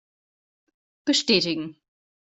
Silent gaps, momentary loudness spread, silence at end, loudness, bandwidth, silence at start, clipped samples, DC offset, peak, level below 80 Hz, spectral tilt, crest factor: none; 13 LU; 0.55 s; -23 LUFS; 8.2 kHz; 1.05 s; under 0.1%; under 0.1%; -6 dBFS; -68 dBFS; -3 dB/octave; 22 dB